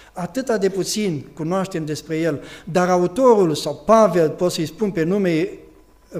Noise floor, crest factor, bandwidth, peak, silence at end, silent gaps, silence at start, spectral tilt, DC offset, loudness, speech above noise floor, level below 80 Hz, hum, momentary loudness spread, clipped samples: -47 dBFS; 18 dB; 15.5 kHz; -2 dBFS; 0 s; none; 0.15 s; -5.5 dB/octave; under 0.1%; -19 LUFS; 28 dB; -52 dBFS; none; 11 LU; under 0.1%